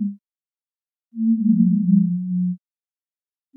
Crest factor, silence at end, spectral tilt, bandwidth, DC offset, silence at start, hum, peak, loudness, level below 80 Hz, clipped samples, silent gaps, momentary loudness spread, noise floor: 16 dB; 1 s; -16.5 dB/octave; 0.3 kHz; under 0.1%; 0 s; none; -6 dBFS; -20 LUFS; under -90 dBFS; under 0.1%; none; 13 LU; under -90 dBFS